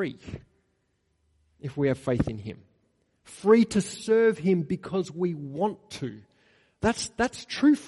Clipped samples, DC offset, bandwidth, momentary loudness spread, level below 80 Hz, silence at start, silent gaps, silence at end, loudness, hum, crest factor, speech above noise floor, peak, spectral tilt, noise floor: under 0.1%; under 0.1%; 11.5 kHz; 17 LU; -54 dBFS; 0 s; none; 0 s; -26 LUFS; none; 20 dB; 47 dB; -8 dBFS; -6 dB/octave; -73 dBFS